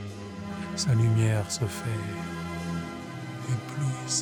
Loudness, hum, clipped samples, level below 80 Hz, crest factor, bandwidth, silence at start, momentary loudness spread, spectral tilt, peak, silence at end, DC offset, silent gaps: -30 LUFS; none; under 0.1%; -58 dBFS; 16 dB; 18 kHz; 0 s; 14 LU; -5 dB/octave; -12 dBFS; 0 s; under 0.1%; none